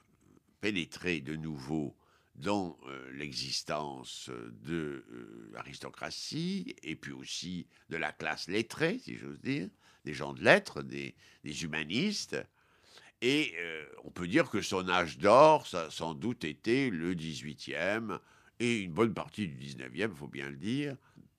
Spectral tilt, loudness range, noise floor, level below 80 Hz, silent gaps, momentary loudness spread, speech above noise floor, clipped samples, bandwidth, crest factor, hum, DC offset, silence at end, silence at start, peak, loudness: -4.5 dB/octave; 11 LU; -66 dBFS; -66 dBFS; none; 15 LU; 32 dB; under 0.1%; 14.5 kHz; 28 dB; none; under 0.1%; 0.4 s; 0.6 s; -6 dBFS; -33 LUFS